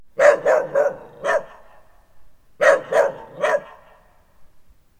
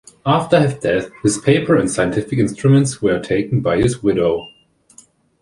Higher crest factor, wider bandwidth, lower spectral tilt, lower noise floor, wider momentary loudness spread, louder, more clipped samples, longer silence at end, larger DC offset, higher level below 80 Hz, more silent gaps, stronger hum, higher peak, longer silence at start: about the same, 20 dB vs 16 dB; first, 13.5 kHz vs 11.5 kHz; second, -3 dB/octave vs -6 dB/octave; about the same, -52 dBFS vs -49 dBFS; first, 9 LU vs 5 LU; about the same, -19 LUFS vs -17 LUFS; neither; second, 0.55 s vs 0.95 s; neither; second, -58 dBFS vs -44 dBFS; neither; neither; about the same, -2 dBFS vs -2 dBFS; about the same, 0.2 s vs 0.25 s